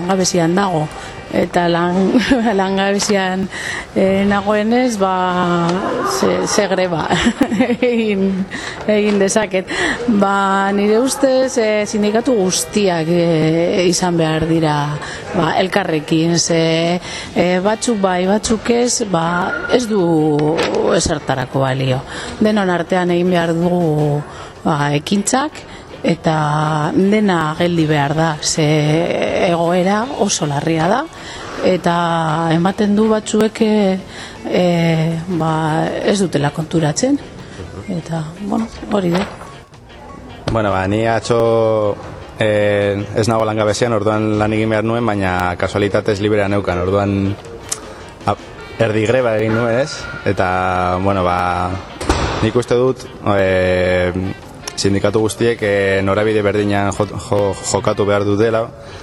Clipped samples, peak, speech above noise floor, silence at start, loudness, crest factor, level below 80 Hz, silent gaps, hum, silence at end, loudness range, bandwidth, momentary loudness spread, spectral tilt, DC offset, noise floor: under 0.1%; 0 dBFS; 22 dB; 0 s; -16 LUFS; 16 dB; -40 dBFS; none; none; 0 s; 3 LU; 13 kHz; 8 LU; -5 dB/octave; under 0.1%; -37 dBFS